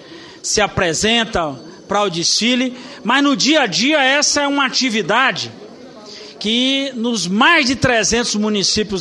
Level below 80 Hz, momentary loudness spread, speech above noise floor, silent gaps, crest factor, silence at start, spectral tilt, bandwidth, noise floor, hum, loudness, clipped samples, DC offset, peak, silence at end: -44 dBFS; 12 LU; 20 dB; none; 16 dB; 0 s; -2.5 dB/octave; 12 kHz; -36 dBFS; none; -15 LUFS; under 0.1%; under 0.1%; 0 dBFS; 0 s